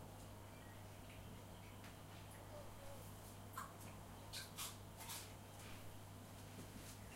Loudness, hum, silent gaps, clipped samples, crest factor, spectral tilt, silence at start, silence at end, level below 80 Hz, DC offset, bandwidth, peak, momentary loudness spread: -55 LUFS; none; none; under 0.1%; 20 dB; -3.5 dB/octave; 0 s; 0 s; -66 dBFS; under 0.1%; 16 kHz; -36 dBFS; 7 LU